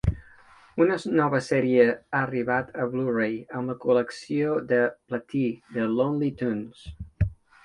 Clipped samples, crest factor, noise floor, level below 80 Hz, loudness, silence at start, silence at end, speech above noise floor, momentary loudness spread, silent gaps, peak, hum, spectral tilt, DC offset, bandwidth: under 0.1%; 20 dB; -53 dBFS; -42 dBFS; -26 LUFS; 0.05 s; 0.3 s; 28 dB; 10 LU; none; -6 dBFS; none; -7.5 dB/octave; under 0.1%; 11 kHz